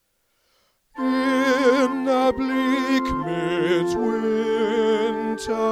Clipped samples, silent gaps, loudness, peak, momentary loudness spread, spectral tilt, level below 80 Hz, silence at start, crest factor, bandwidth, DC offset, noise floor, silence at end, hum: under 0.1%; none; -21 LUFS; -6 dBFS; 6 LU; -5 dB/octave; -48 dBFS; 0.95 s; 16 dB; 14 kHz; under 0.1%; -68 dBFS; 0 s; none